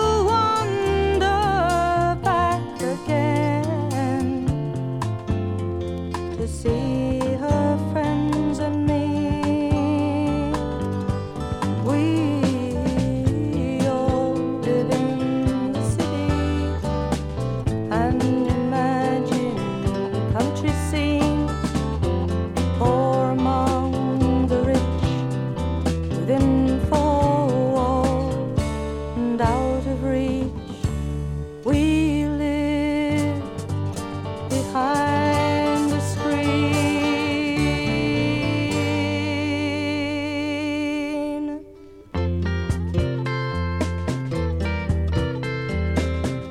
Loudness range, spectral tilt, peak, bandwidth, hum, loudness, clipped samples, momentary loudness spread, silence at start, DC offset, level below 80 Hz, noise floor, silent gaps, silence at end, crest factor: 4 LU; -6.5 dB/octave; -4 dBFS; 14 kHz; none; -23 LUFS; under 0.1%; 7 LU; 0 s; under 0.1%; -34 dBFS; -44 dBFS; none; 0 s; 16 dB